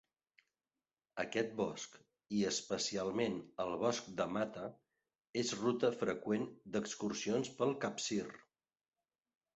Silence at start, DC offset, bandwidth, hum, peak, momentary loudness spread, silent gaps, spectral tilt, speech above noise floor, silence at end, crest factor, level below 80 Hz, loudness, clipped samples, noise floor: 1.15 s; under 0.1%; 8 kHz; none; -20 dBFS; 8 LU; 5.29-5.33 s; -4 dB/octave; over 52 dB; 1.2 s; 20 dB; -76 dBFS; -39 LUFS; under 0.1%; under -90 dBFS